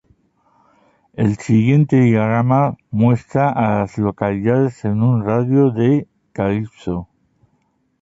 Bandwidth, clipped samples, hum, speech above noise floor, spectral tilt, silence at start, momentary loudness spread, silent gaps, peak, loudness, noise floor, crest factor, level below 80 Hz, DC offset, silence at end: 7.8 kHz; under 0.1%; none; 48 dB; -9 dB/octave; 1.2 s; 9 LU; none; -2 dBFS; -17 LUFS; -64 dBFS; 16 dB; -48 dBFS; under 0.1%; 0.95 s